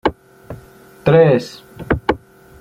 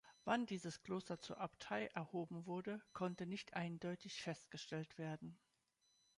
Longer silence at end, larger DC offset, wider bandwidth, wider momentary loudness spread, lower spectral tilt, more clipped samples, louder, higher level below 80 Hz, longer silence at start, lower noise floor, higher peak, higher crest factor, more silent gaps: second, 0.45 s vs 0.8 s; neither; first, 15 kHz vs 11 kHz; first, 25 LU vs 7 LU; first, -7.5 dB/octave vs -5.5 dB/octave; neither; first, -16 LUFS vs -47 LUFS; first, -38 dBFS vs -82 dBFS; about the same, 0.05 s vs 0.05 s; second, -42 dBFS vs -82 dBFS; first, -2 dBFS vs -26 dBFS; second, 16 dB vs 22 dB; neither